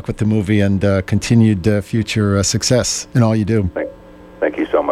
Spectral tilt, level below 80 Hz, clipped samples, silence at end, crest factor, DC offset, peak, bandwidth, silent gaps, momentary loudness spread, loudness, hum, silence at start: -5.5 dB/octave; -40 dBFS; under 0.1%; 0 s; 14 dB; under 0.1%; -2 dBFS; 14 kHz; none; 8 LU; -16 LUFS; none; 0.05 s